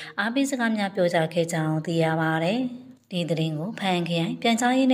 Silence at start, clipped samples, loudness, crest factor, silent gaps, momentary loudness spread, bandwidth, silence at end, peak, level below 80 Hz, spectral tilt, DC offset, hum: 0 s; under 0.1%; -25 LUFS; 16 dB; none; 6 LU; 16 kHz; 0 s; -8 dBFS; -72 dBFS; -5.5 dB/octave; under 0.1%; none